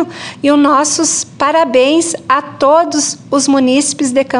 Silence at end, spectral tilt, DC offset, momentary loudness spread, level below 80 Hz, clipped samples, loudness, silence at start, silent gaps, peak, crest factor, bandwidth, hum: 0 s; -2.5 dB/octave; under 0.1%; 5 LU; -56 dBFS; under 0.1%; -12 LUFS; 0 s; none; 0 dBFS; 12 dB; 11.5 kHz; none